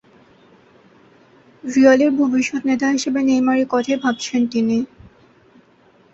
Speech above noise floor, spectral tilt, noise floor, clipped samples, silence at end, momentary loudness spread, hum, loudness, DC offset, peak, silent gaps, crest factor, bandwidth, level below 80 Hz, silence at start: 37 dB; -4 dB/octave; -53 dBFS; under 0.1%; 1.3 s; 8 LU; none; -17 LUFS; under 0.1%; -2 dBFS; none; 18 dB; 8 kHz; -60 dBFS; 1.65 s